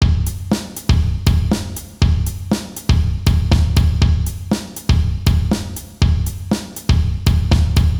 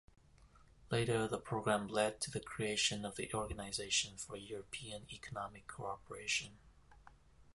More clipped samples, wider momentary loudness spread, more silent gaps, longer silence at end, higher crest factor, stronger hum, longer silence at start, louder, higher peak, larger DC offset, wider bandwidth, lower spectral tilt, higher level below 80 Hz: neither; second, 7 LU vs 13 LU; neither; about the same, 0 s vs 0.1 s; second, 16 dB vs 22 dB; neither; second, 0 s vs 0.4 s; first, -18 LUFS vs -39 LUFS; first, 0 dBFS vs -20 dBFS; neither; first, over 20 kHz vs 11.5 kHz; first, -6 dB/octave vs -3 dB/octave; first, -20 dBFS vs -62 dBFS